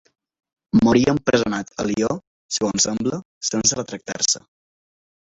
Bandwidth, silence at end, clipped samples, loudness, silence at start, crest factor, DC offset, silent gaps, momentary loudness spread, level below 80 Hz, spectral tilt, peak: 8.4 kHz; 0.85 s; under 0.1%; -20 LUFS; 0.75 s; 20 dB; under 0.1%; 2.27-2.49 s, 3.25-3.41 s; 10 LU; -50 dBFS; -3.5 dB/octave; -2 dBFS